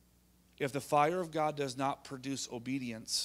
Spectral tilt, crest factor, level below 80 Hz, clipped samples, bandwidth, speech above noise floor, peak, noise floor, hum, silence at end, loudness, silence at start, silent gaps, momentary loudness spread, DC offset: -4 dB/octave; 22 dB; -70 dBFS; under 0.1%; 16 kHz; 32 dB; -14 dBFS; -67 dBFS; none; 0 s; -35 LUFS; 0.6 s; none; 9 LU; under 0.1%